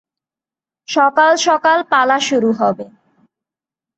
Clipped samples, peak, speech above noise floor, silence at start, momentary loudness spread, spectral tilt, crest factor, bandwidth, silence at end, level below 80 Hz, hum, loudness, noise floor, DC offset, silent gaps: under 0.1%; -2 dBFS; 76 dB; 0.9 s; 9 LU; -3 dB/octave; 14 dB; 8.4 kHz; 1.1 s; -68 dBFS; none; -14 LUFS; -90 dBFS; under 0.1%; none